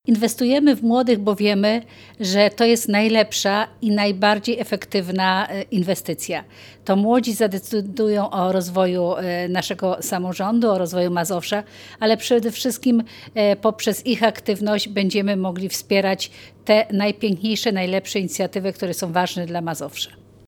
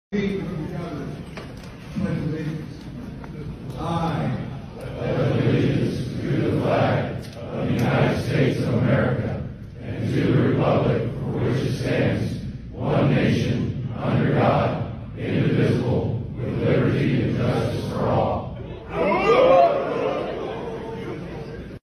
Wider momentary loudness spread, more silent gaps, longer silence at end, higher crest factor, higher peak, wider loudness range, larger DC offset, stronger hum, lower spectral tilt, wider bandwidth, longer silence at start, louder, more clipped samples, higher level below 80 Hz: second, 8 LU vs 14 LU; neither; first, 0.4 s vs 0.05 s; about the same, 18 dB vs 18 dB; about the same, -2 dBFS vs -4 dBFS; second, 3 LU vs 8 LU; neither; neither; second, -4.5 dB/octave vs -8 dB/octave; first, 19 kHz vs 13 kHz; about the same, 0.05 s vs 0.1 s; first, -20 LUFS vs -23 LUFS; neither; second, -64 dBFS vs -42 dBFS